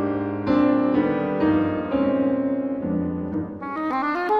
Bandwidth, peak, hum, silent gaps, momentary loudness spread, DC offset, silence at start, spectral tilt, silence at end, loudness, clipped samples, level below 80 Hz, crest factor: 5.2 kHz; -8 dBFS; none; none; 8 LU; under 0.1%; 0 s; -9.5 dB/octave; 0 s; -23 LUFS; under 0.1%; -50 dBFS; 14 dB